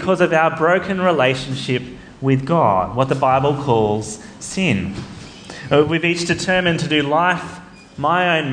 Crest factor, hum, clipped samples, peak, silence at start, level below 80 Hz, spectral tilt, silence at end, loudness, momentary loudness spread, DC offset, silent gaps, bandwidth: 16 dB; none; under 0.1%; -2 dBFS; 0 s; -48 dBFS; -5.5 dB/octave; 0 s; -17 LUFS; 15 LU; under 0.1%; none; 10 kHz